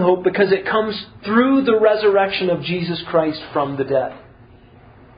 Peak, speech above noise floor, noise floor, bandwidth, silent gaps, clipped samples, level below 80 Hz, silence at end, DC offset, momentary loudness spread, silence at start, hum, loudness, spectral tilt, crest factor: -2 dBFS; 28 dB; -46 dBFS; 5.2 kHz; none; under 0.1%; -52 dBFS; 0.95 s; under 0.1%; 8 LU; 0 s; none; -18 LUFS; -11 dB/octave; 16 dB